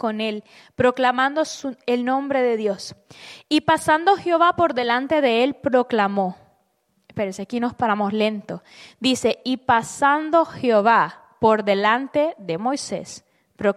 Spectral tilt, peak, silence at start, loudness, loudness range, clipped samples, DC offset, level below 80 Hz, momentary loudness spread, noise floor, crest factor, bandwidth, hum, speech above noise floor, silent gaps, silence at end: -4.5 dB/octave; -4 dBFS; 0.05 s; -20 LUFS; 4 LU; under 0.1%; under 0.1%; -60 dBFS; 12 LU; -67 dBFS; 18 dB; 14 kHz; none; 47 dB; none; 0.05 s